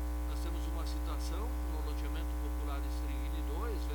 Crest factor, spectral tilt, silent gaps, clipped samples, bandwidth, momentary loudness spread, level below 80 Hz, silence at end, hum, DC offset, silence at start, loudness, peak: 10 dB; -6 dB/octave; none; under 0.1%; 19 kHz; 1 LU; -36 dBFS; 0 s; 60 Hz at -35 dBFS; under 0.1%; 0 s; -38 LUFS; -26 dBFS